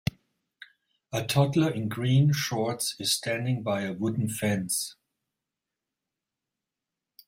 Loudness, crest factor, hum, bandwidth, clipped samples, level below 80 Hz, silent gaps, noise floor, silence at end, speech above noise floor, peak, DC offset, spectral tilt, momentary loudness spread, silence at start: -27 LUFS; 20 dB; none; 16 kHz; under 0.1%; -60 dBFS; none; -88 dBFS; 2.35 s; 61 dB; -8 dBFS; under 0.1%; -5 dB/octave; 7 LU; 1.1 s